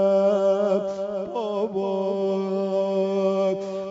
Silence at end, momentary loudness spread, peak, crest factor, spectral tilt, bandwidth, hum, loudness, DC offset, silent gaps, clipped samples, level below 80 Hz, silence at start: 0 s; 8 LU; -12 dBFS; 12 dB; -7.5 dB/octave; 7.8 kHz; none; -24 LUFS; under 0.1%; none; under 0.1%; -72 dBFS; 0 s